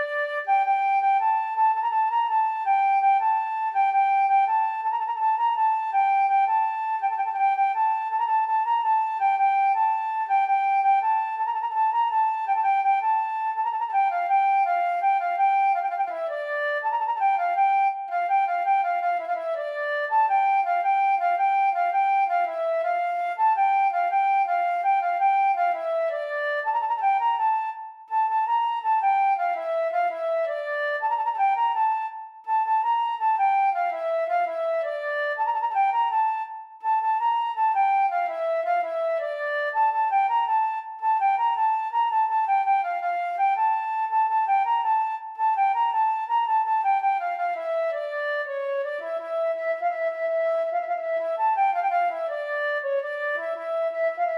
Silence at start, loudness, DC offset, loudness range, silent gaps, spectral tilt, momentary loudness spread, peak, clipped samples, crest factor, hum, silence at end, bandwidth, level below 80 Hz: 0 s; -24 LUFS; under 0.1%; 3 LU; none; 0 dB/octave; 6 LU; -12 dBFS; under 0.1%; 10 dB; none; 0 s; 5.8 kHz; under -90 dBFS